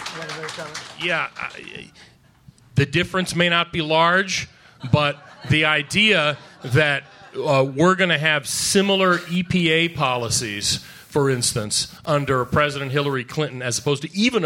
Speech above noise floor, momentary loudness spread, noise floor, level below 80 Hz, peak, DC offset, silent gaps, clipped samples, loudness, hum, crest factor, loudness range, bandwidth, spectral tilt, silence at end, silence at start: 30 dB; 13 LU; -51 dBFS; -50 dBFS; -4 dBFS; under 0.1%; none; under 0.1%; -20 LUFS; none; 18 dB; 3 LU; 16.5 kHz; -4 dB/octave; 0 s; 0 s